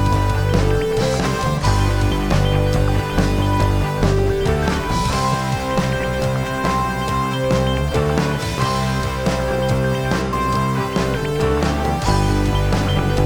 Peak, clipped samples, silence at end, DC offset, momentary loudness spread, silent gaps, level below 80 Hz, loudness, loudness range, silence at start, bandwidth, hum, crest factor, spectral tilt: -2 dBFS; under 0.1%; 0 s; 0.4%; 3 LU; none; -26 dBFS; -19 LUFS; 1 LU; 0 s; over 20 kHz; none; 16 dB; -6 dB/octave